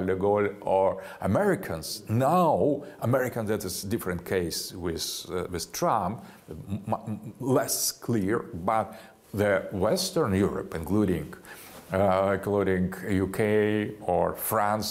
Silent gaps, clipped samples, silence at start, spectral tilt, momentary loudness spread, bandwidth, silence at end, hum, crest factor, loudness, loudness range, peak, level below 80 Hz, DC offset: none; under 0.1%; 0 s; -5 dB/octave; 10 LU; 16 kHz; 0 s; none; 16 dB; -27 LUFS; 4 LU; -10 dBFS; -54 dBFS; under 0.1%